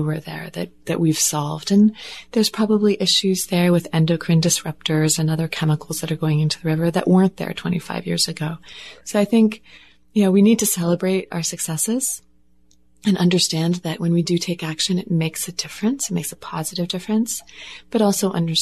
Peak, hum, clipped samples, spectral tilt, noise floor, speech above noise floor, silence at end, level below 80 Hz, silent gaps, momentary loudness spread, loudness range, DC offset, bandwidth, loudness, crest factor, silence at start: -4 dBFS; none; under 0.1%; -4.5 dB/octave; -59 dBFS; 40 dB; 0 s; -58 dBFS; none; 11 LU; 4 LU; 0.3%; 13.5 kHz; -20 LUFS; 16 dB; 0 s